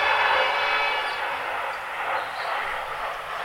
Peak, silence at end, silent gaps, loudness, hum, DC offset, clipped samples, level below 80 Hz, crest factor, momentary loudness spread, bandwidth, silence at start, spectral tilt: -8 dBFS; 0 s; none; -25 LUFS; none; under 0.1%; under 0.1%; -56 dBFS; 18 dB; 9 LU; 16.5 kHz; 0 s; -1.5 dB/octave